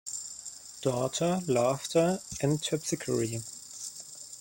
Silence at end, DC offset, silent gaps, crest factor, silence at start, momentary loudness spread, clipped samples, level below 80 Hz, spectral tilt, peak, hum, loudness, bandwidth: 0 s; under 0.1%; none; 18 dB; 0.05 s; 14 LU; under 0.1%; -64 dBFS; -4.5 dB/octave; -14 dBFS; none; -30 LUFS; 17 kHz